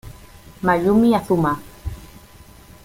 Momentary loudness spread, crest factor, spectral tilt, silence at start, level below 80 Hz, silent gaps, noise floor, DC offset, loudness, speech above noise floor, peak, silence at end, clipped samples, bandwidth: 19 LU; 16 dB; -7.5 dB/octave; 0.05 s; -42 dBFS; none; -45 dBFS; under 0.1%; -18 LUFS; 28 dB; -4 dBFS; 0.8 s; under 0.1%; 16.5 kHz